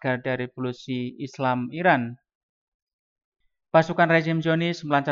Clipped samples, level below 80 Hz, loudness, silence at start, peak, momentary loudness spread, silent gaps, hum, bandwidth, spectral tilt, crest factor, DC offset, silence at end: under 0.1%; -68 dBFS; -24 LUFS; 0 s; -6 dBFS; 11 LU; 2.35-2.87 s, 2.93-3.16 s, 3.24-3.32 s; none; 7.4 kHz; -7 dB/octave; 20 dB; under 0.1%; 0 s